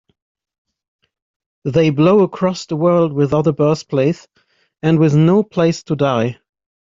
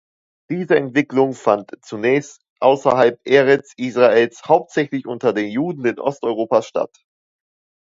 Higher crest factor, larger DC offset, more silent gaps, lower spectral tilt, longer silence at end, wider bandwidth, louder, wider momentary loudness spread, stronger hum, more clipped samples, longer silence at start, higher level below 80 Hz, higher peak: about the same, 14 dB vs 18 dB; neither; second, none vs 2.50-2.56 s; first, -7.5 dB/octave vs -6 dB/octave; second, 0.6 s vs 1.1 s; about the same, 7.6 kHz vs 7.8 kHz; first, -15 LUFS vs -18 LUFS; about the same, 8 LU vs 10 LU; neither; neither; first, 1.65 s vs 0.5 s; first, -52 dBFS vs -66 dBFS; about the same, -2 dBFS vs 0 dBFS